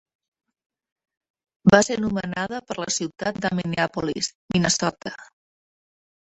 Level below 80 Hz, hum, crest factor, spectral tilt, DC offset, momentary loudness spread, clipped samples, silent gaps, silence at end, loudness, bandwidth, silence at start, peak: -54 dBFS; none; 24 dB; -4 dB/octave; under 0.1%; 12 LU; under 0.1%; 4.35-4.49 s; 1.05 s; -23 LUFS; 8.4 kHz; 1.65 s; -2 dBFS